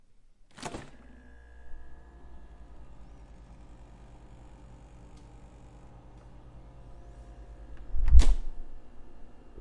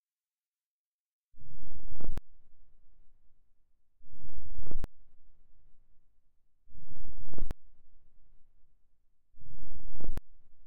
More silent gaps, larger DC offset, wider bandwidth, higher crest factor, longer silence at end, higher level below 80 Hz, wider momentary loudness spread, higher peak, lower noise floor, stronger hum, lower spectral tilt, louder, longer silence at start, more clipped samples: second, none vs 0.00-0.17 s, 0.26-0.53 s, 0.60-1.32 s; neither; first, 9.4 kHz vs 1.9 kHz; first, 26 dB vs 12 dB; first, 0.35 s vs 0 s; first, -32 dBFS vs -42 dBFS; first, 21 LU vs 14 LU; first, -2 dBFS vs -12 dBFS; second, -56 dBFS vs under -90 dBFS; neither; second, -5.5 dB/octave vs -8 dB/octave; first, -30 LUFS vs -49 LUFS; first, 0.65 s vs 0 s; neither